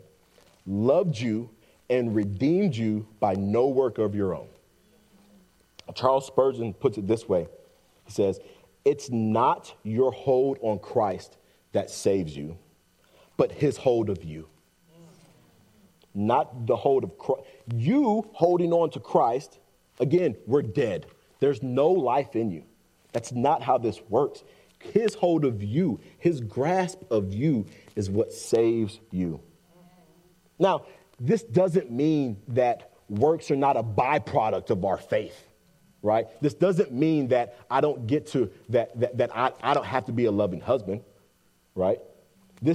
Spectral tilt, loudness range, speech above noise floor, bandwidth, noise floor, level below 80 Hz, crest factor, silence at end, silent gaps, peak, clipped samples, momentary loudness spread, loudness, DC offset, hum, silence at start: -7 dB/octave; 4 LU; 40 dB; 13.5 kHz; -65 dBFS; -66 dBFS; 20 dB; 0 s; none; -6 dBFS; under 0.1%; 9 LU; -26 LUFS; under 0.1%; none; 0.65 s